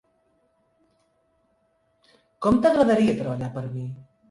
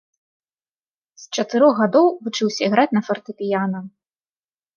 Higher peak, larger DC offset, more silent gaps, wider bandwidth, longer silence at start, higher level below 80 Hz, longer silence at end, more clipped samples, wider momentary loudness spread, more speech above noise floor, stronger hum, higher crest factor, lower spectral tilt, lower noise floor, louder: about the same, -6 dBFS vs -4 dBFS; neither; neither; first, 11.5 kHz vs 7.2 kHz; first, 2.4 s vs 1.2 s; first, -54 dBFS vs -74 dBFS; second, 0.3 s vs 0.9 s; neither; first, 16 LU vs 11 LU; second, 46 dB vs over 71 dB; neither; about the same, 18 dB vs 18 dB; first, -7.5 dB/octave vs -5 dB/octave; second, -68 dBFS vs under -90 dBFS; second, -22 LUFS vs -19 LUFS